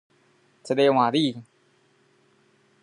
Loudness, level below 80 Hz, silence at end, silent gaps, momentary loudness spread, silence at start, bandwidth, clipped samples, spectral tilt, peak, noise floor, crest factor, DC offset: -22 LUFS; -78 dBFS; 1.4 s; none; 11 LU; 0.65 s; 11 kHz; under 0.1%; -6 dB/octave; -8 dBFS; -63 dBFS; 20 dB; under 0.1%